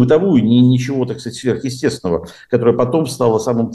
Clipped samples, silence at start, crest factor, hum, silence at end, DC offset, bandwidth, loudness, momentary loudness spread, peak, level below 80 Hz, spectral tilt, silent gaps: under 0.1%; 0 s; 12 dB; none; 0 s; under 0.1%; 12.5 kHz; -16 LUFS; 9 LU; -2 dBFS; -50 dBFS; -7 dB/octave; none